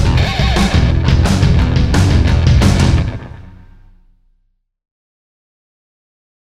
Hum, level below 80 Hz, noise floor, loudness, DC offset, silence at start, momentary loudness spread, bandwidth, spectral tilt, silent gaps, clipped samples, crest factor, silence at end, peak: none; -18 dBFS; -61 dBFS; -13 LUFS; under 0.1%; 0 s; 5 LU; 12.5 kHz; -6 dB/octave; none; under 0.1%; 14 dB; 2.95 s; 0 dBFS